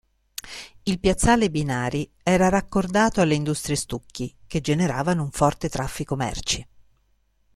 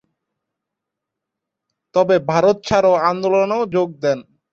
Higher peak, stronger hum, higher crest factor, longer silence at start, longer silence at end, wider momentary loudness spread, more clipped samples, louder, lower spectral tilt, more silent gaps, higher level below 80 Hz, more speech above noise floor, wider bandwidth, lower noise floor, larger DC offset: second, -6 dBFS vs -2 dBFS; neither; about the same, 18 dB vs 16 dB; second, 0.45 s vs 1.95 s; first, 0.95 s vs 0.3 s; first, 14 LU vs 7 LU; neither; second, -23 LUFS vs -17 LUFS; about the same, -5 dB/octave vs -6 dB/octave; neither; first, -40 dBFS vs -54 dBFS; second, 42 dB vs 66 dB; first, 14.5 kHz vs 7.6 kHz; second, -65 dBFS vs -82 dBFS; neither